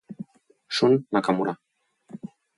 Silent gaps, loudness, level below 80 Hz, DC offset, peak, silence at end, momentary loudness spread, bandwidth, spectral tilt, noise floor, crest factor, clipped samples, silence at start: none; -24 LUFS; -70 dBFS; under 0.1%; -8 dBFS; 0.3 s; 21 LU; 11.5 kHz; -6 dB/octave; -54 dBFS; 20 dB; under 0.1%; 0.1 s